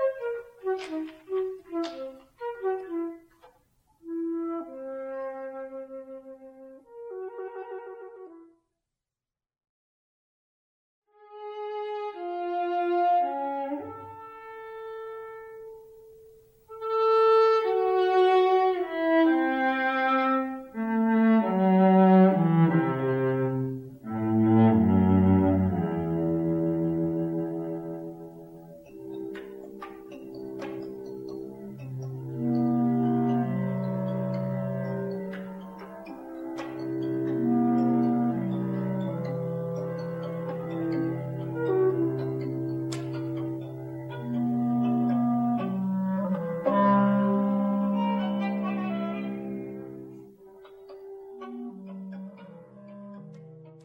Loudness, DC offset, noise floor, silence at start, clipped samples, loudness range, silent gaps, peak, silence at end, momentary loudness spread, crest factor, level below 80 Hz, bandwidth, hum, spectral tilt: -26 LUFS; under 0.1%; under -90 dBFS; 0 s; under 0.1%; 17 LU; 9.69-11.02 s; -10 dBFS; 0.05 s; 21 LU; 18 dB; -64 dBFS; 16.5 kHz; none; -9 dB/octave